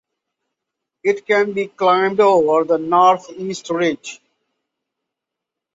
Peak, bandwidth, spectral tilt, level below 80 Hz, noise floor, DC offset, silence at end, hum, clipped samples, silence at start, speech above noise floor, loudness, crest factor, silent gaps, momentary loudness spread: -2 dBFS; 8 kHz; -5 dB/octave; -66 dBFS; -83 dBFS; under 0.1%; 1.6 s; none; under 0.1%; 1.05 s; 67 dB; -16 LUFS; 18 dB; none; 13 LU